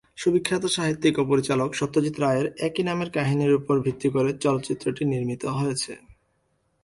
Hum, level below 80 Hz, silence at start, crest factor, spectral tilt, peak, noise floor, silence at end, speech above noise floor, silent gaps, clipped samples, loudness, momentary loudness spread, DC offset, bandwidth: none; -58 dBFS; 0.15 s; 16 dB; -5.5 dB/octave; -8 dBFS; -70 dBFS; 0.85 s; 46 dB; none; under 0.1%; -24 LUFS; 5 LU; under 0.1%; 11.5 kHz